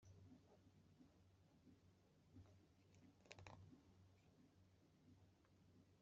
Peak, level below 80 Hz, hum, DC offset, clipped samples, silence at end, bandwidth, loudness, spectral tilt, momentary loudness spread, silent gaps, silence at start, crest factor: -38 dBFS; -86 dBFS; none; under 0.1%; under 0.1%; 0 s; 7.2 kHz; -66 LUFS; -5 dB/octave; 6 LU; none; 0 s; 32 dB